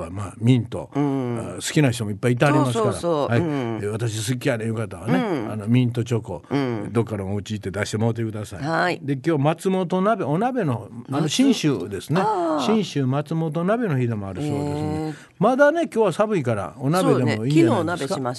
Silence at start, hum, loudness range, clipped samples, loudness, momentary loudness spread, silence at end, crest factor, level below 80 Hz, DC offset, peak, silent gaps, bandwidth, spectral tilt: 0 s; none; 3 LU; under 0.1%; -22 LUFS; 9 LU; 0 s; 18 dB; -52 dBFS; under 0.1%; -4 dBFS; none; 12.5 kHz; -6.5 dB/octave